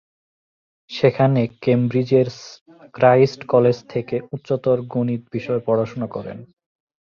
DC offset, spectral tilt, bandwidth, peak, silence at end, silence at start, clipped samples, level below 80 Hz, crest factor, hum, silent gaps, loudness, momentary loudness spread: under 0.1%; -8 dB/octave; 7 kHz; -2 dBFS; 0.75 s; 0.9 s; under 0.1%; -60 dBFS; 18 dB; none; 2.61-2.66 s; -19 LUFS; 14 LU